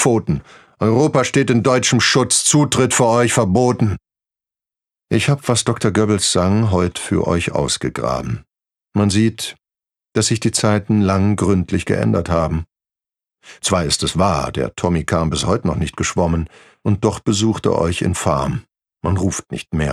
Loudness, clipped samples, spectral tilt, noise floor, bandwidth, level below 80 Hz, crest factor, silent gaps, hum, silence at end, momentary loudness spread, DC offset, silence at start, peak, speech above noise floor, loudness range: -17 LUFS; under 0.1%; -4.5 dB/octave; -87 dBFS; 14 kHz; -40 dBFS; 16 dB; none; none; 0 s; 10 LU; under 0.1%; 0 s; -2 dBFS; 70 dB; 5 LU